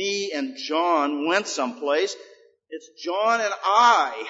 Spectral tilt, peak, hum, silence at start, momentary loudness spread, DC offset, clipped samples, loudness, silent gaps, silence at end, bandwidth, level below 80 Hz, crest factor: -2 dB/octave; -6 dBFS; none; 0 s; 18 LU; under 0.1%; under 0.1%; -22 LUFS; none; 0 s; 8 kHz; -84 dBFS; 18 dB